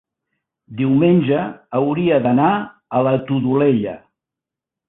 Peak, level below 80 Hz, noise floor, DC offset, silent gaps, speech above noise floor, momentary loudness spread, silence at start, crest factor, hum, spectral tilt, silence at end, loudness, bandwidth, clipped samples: -4 dBFS; -56 dBFS; -86 dBFS; under 0.1%; none; 70 dB; 9 LU; 0.7 s; 14 dB; none; -12.5 dB/octave; 0.9 s; -17 LUFS; 4 kHz; under 0.1%